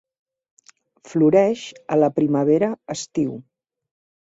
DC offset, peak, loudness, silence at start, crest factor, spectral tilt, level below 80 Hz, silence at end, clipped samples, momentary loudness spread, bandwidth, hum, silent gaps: under 0.1%; -4 dBFS; -20 LUFS; 1.1 s; 18 dB; -6.5 dB/octave; -64 dBFS; 0.9 s; under 0.1%; 12 LU; 8 kHz; none; none